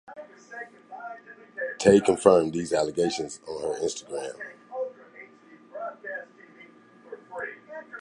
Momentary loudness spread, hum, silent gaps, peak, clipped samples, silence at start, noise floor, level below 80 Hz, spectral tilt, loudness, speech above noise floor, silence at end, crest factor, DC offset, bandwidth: 26 LU; none; none; -4 dBFS; under 0.1%; 0.1 s; -53 dBFS; -62 dBFS; -5 dB/octave; -26 LUFS; 29 dB; 0 s; 24 dB; under 0.1%; 11.5 kHz